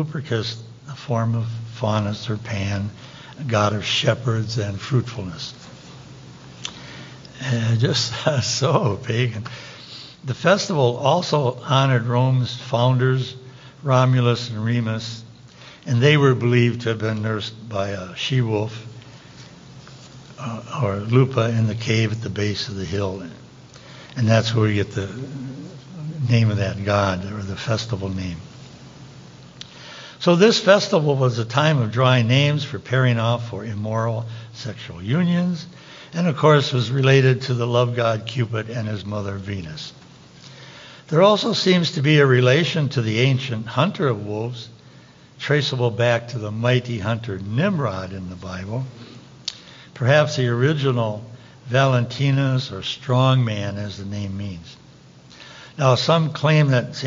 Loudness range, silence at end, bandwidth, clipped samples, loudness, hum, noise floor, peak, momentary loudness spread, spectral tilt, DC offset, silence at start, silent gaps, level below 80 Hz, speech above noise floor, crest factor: 7 LU; 0 s; 7.6 kHz; under 0.1%; -20 LUFS; none; -47 dBFS; -2 dBFS; 20 LU; -6 dB/octave; under 0.1%; 0 s; none; -56 dBFS; 27 dB; 18 dB